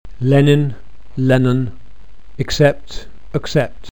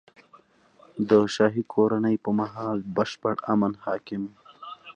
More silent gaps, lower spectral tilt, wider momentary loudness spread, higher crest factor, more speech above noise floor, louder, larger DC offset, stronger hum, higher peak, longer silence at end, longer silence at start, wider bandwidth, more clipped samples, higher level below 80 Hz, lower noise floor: neither; about the same, -7 dB/octave vs -6.5 dB/octave; about the same, 17 LU vs 17 LU; about the same, 16 dB vs 20 dB; second, 27 dB vs 33 dB; first, -16 LUFS vs -25 LUFS; first, 5% vs under 0.1%; neither; first, 0 dBFS vs -6 dBFS; about the same, 0.05 s vs 0.05 s; second, 0.05 s vs 0.95 s; first, 19 kHz vs 9 kHz; neither; first, -38 dBFS vs -66 dBFS; second, -42 dBFS vs -57 dBFS